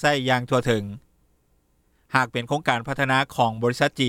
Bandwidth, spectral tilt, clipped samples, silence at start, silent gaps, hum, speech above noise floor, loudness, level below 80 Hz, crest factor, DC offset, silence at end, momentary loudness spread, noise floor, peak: 16 kHz; -5 dB/octave; under 0.1%; 0 s; none; none; 42 dB; -23 LUFS; -56 dBFS; 22 dB; under 0.1%; 0 s; 4 LU; -65 dBFS; -2 dBFS